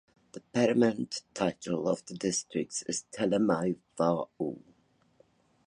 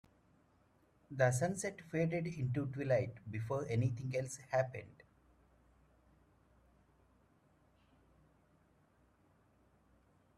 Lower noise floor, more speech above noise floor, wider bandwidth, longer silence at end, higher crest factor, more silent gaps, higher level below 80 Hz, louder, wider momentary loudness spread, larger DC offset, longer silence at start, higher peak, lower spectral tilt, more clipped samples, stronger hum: second, -67 dBFS vs -72 dBFS; about the same, 37 dB vs 35 dB; second, 11 kHz vs 13.5 kHz; second, 1.1 s vs 5.45 s; about the same, 20 dB vs 24 dB; neither; about the same, -68 dBFS vs -70 dBFS; first, -31 LUFS vs -38 LUFS; about the same, 10 LU vs 8 LU; neither; second, 0.35 s vs 1.1 s; first, -12 dBFS vs -18 dBFS; second, -5 dB/octave vs -6.5 dB/octave; neither; neither